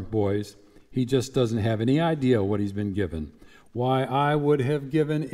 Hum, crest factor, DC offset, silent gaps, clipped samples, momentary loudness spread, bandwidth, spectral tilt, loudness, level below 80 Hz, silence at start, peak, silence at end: none; 16 dB; under 0.1%; none; under 0.1%; 9 LU; 14.5 kHz; -7 dB/octave; -25 LUFS; -50 dBFS; 0 s; -10 dBFS; 0 s